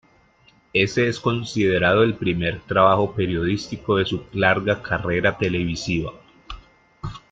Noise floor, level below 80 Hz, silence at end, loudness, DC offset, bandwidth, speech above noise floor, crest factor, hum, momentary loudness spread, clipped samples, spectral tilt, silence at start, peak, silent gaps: -57 dBFS; -46 dBFS; 0.15 s; -21 LUFS; under 0.1%; 8.6 kHz; 36 dB; 20 dB; none; 18 LU; under 0.1%; -6 dB/octave; 0.75 s; -2 dBFS; none